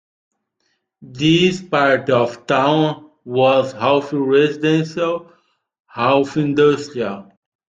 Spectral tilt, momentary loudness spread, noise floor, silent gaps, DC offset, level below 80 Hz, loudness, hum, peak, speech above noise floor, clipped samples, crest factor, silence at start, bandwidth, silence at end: -6 dB/octave; 10 LU; -69 dBFS; 5.80-5.84 s; under 0.1%; -58 dBFS; -17 LUFS; none; -2 dBFS; 53 dB; under 0.1%; 16 dB; 1 s; 9 kHz; 0.45 s